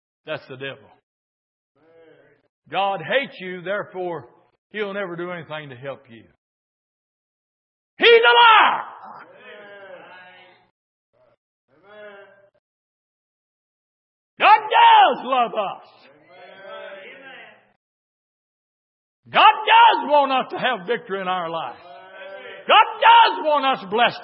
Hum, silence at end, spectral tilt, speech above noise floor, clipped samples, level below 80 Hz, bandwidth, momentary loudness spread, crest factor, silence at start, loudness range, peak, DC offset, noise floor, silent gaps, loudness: none; 0 s; -7.5 dB/octave; 35 dB; under 0.1%; -82 dBFS; 5.8 kHz; 25 LU; 20 dB; 0.3 s; 14 LU; 0 dBFS; under 0.1%; -53 dBFS; 1.03-1.75 s, 2.49-2.62 s, 4.58-4.70 s, 6.38-7.97 s, 10.71-11.13 s, 11.37-11.68 s, 12.59-14.37 s, 17.76-19.23 s; -16 LUFS